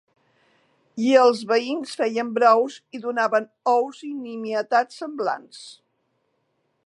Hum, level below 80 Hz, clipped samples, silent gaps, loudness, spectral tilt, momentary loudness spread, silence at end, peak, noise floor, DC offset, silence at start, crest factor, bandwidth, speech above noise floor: none; -84 dBFS; under 0.1%; none; -22 LUFS; -4 dB/octave; 15 LU; 1.15 s; -4 dBFS; -71 dBFS; under 0.1%; 0.95 s; 20 dB; 11 kHz; 50 dB